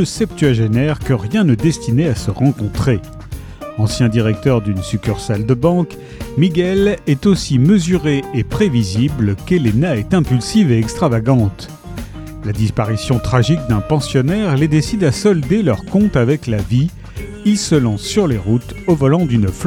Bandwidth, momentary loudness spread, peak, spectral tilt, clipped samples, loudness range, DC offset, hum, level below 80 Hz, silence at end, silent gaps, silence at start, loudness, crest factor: 17.5 kHz; 8 LU; 0 dBFS; -6.5 dB/octave; under 0.1%; 2 LU; under 0.1%; none; -34 dBFS; 0 s; none; 0 s; -15 LUFS; 14 dB